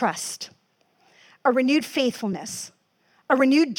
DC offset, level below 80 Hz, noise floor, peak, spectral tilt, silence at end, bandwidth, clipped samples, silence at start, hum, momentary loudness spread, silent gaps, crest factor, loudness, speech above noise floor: under 0.1%; -76 dBFS; -65 dBFS; -6 dBFS; -3.5 dB/octave; 0.05 s; 18 kHz; under 0.1%; 0 s; none; 16 LU; none; 18 dB; -23 LUFS; 43 dB